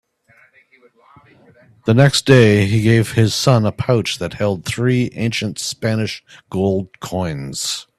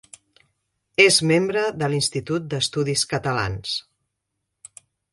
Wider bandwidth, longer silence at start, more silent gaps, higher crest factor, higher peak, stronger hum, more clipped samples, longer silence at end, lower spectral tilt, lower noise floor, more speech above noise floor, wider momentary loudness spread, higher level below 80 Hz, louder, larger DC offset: first, 14 kHz vs 11.5 kHz; first, 1.85 s vs 1 s; neither; about the same, 18 dB vs 22 dB; about the same, 0 dBFS vs -2 dBFS; neither; neither; second, 0.15 s vs 1.3 s; first, -5.5 dB/octave vs -3.5 dB/octave; second, -54 dBFS vs -79 dBFS; second, 37 dB vs 58 dB; about the same, 13 LU vs 12 LU; about the same, -48 dBFS vs -52 dBFS; first, -17 LUFS vs -21 LUFS; neither